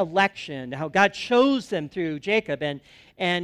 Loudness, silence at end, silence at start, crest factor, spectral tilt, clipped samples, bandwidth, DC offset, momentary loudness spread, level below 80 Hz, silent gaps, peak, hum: -24 LUFS; 0 s; 0 s; 20 dB; -5 dB/octave; under 0.1%; 12 kHz; under 0.1%; 12 LU; -62 dBFS; none; -4 dBFS; none